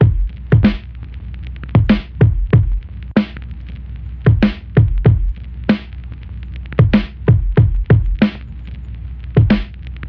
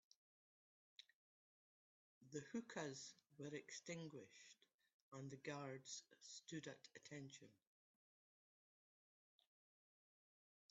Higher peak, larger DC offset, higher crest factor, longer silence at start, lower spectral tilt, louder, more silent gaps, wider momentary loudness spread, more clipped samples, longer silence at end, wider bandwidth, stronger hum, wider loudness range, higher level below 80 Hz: first, -2 dBFS vs -36 dBFS; first, 0.3% vs under 0.1%; second, 14 dB vs 22 dB; second, 0 s vs 1 s; first, -10.5 dB/octave vs -4.5 dB/octave; first, -16 LUFS vs -55 LUFS; second, none vs 1.13-2.21 s, 4.74-4.78 s, 4.94-5.12 s; first, 18 LU vs 13 LU; neither; second, 0 s vs 3.15 s; second, 5.4 kHz vs 8 kHz; neither; second, 2 LU vs 6 LU; first, -22 dBFS vs under -90 dBFS